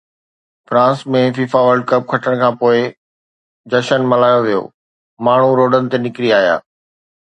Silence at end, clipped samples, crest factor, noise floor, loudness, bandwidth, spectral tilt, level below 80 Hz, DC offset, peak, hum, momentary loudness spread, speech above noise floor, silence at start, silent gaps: 0.6 s; under 0.1%; 14 dB; under -90 dBFS; -14 LUFS; 9.2 kHz; -6.5 dB/octave; -62 dBFS; under 0.1%; 0 dBFS; none; 7 LU; over 77 dB; 0.7 s; 2.97-3.64 s, 4.74-5.17 s